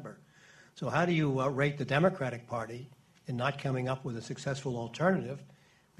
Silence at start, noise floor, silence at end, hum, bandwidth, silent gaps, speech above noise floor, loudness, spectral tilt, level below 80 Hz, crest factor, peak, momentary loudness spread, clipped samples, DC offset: 0 s; -59 dBFS; 0.5 s; none; 12 kHz; none; 27 dB; -32 LUFS; -6.5 dB/octave; -66 dBFS; 20 dB; -14 dBFS; 15 LU; under 0.1%; under 0.1%